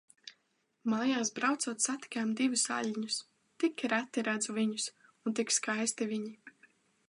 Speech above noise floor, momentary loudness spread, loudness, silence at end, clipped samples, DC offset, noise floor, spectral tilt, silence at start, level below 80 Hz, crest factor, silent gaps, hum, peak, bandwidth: 44 dB; 9 LU; -33 LUFS; 0.6 s; under 0.1%; under 0.1%; -77 dBFS; -2.5 dB/octave; 0.25 s; -88 dBFS; 18 dB; none; none; -16 dBFS; 11 kHz